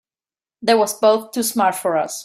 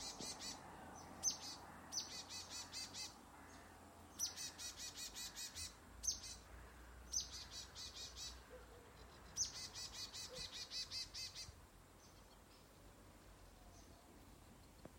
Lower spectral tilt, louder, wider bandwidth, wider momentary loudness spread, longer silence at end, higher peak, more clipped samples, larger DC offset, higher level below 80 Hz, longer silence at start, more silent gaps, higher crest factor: first, -3 dB/octave vs -0.5 dB/octave; first, -18 LUFS vs -48 LUFS; about the same, 16 kHz vs 16.5 kHz; second, 5 LU vs 20 LU; about the same, 0 s vs 0 s; first, -4 dBFS vs -28 dBFS; neither; neither; about the same, -68 dBFS vs -66 dBFS; first, 0.6 s vs 0 s; neither; second, 16 dB vs 24 dB